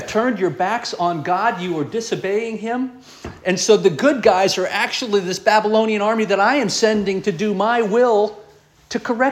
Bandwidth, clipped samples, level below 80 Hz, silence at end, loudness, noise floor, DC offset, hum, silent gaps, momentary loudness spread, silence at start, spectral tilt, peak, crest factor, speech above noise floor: 13.5 kHz; under 0.1%; -56 dBFS; 0 s; -18 LUFS; -48 dBFS; under 0.1%; none; none; 9 LU; 0 s; -4 dB/octave; -2 dBFS; 18 dB; 30 dB